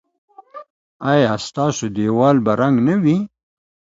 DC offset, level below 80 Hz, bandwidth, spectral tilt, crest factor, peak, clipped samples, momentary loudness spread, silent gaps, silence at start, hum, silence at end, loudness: under 0.1%; -56 dBFS; 7.8 kHz; -6.5 dB/octave; 18 dB; 0 dBFS; under 0.1%; 7 LU; 0.70-1.00 s; 0.55 s; none; 0.65 s; -17 LUFS